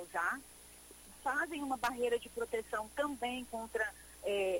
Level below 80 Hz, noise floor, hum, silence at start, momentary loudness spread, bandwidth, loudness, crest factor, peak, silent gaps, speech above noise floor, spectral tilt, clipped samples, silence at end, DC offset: -64 dBFS; -56 dBFS; 60 Hz at -65 dBFS; 0 s; 17 LU; 16.5 kHz; -38 LUFS; 16 dB; -22 dBFS; none; 19 dB; -3 dB/octave; under 0.1%; 0 s; under 0.1%